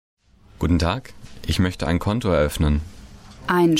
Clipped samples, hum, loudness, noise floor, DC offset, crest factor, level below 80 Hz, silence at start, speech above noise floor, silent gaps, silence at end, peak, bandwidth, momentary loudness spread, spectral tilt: under 0.1%; none; -22 LUFS; -42 dBFS; under 0.1%; 14 dB; -32 dBFS; 0.6 s; 22 dB; none; 0 s; -8 dBFS; 16.5 kHz; 14 LU; -6 dB/octave